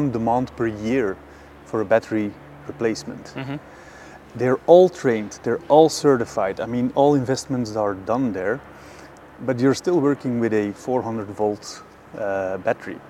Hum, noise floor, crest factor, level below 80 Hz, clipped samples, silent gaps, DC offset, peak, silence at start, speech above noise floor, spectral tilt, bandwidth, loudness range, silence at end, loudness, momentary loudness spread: none; -43 dBFS; 20 dB; -54 dBFS; under 0.1%; none; under 0.1%; 0 dBFS; 0 s; 22 dB; -6 dB/octave; 14.5 kHz; 7 LU; 0 s; -21 LUFS; 19 LU